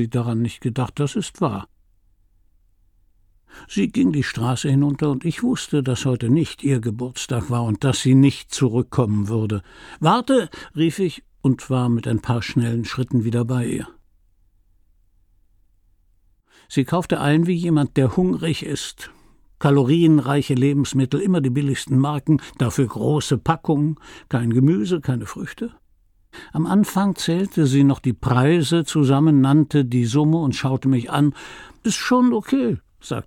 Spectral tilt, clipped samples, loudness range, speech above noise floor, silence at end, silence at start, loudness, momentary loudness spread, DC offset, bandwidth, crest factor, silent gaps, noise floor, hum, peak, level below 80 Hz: -6.5 dB/octave; under 0.1%; 8 LU; 40 dB; 0.05 s; 0 s; -20 LUFS; 10 LU; under 0.1%; 15 kHz; 18 dB; none; -59 dBFS; none; -4 dBFS; -50 dBFS